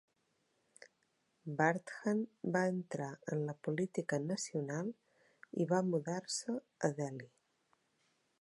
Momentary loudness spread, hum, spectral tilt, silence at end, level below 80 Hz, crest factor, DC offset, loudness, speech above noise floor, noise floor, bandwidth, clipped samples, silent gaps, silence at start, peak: 10 LU; none; -5.5 dB/octave; 1.15 s; -86 dBFS; 22 dB; under 0.1%; -38 LUFS; 42 dB; -80 dBFS; 11.5 kHz; under 0.1%; none; 1.45 s; -16 dBFS